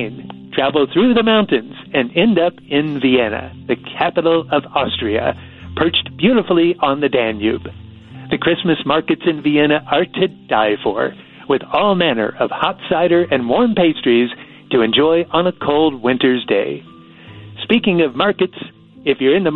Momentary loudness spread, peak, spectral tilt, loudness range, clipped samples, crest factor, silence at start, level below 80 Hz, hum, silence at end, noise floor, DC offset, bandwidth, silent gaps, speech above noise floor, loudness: 10 LU; 0 dBFS; -9 dB/octave; 2 LU; under 0.1%; 16 dB; 0 s; -48 dBFS; none; 0 s; -39 dBFS; under 0.1%; 4.3 kHz; none; 24 dB; -16 LUFS